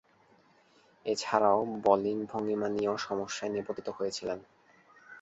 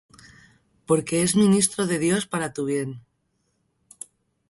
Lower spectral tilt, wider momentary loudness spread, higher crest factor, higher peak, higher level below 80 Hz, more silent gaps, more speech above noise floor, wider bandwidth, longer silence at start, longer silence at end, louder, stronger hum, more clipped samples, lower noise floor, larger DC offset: about the same, -4.5 dB/octave vs -4.5 dB/octave; second, 11 LU vs 23 LU; first, 24 dB vs 18 dB; second, -10 dBFS vs -6 dBFS; second, -70 dBFS vs -60 dBFS; neither; second, 34 dB vs 50 dB; second, 8.2 kHz vs 12 kHz; first, 1.05 s vs 0.9 s; second, 0 s vs 1.5 s; second, -31 LUFS vs -22 LUFS; neither; neither; second, -64 dBFS vs -72 dBFS; neither